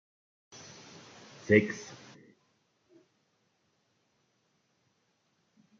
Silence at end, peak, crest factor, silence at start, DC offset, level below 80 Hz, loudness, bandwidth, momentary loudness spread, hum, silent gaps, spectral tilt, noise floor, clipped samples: 3.85 s; -8 dBFS; 28 dB; 1.45 s; under 0.1%; -76 dBFS; -28 LUFS; 7.4 kHz; 26 LU; none; none; -6 dB/octave; -75 dBFS; under 0.1%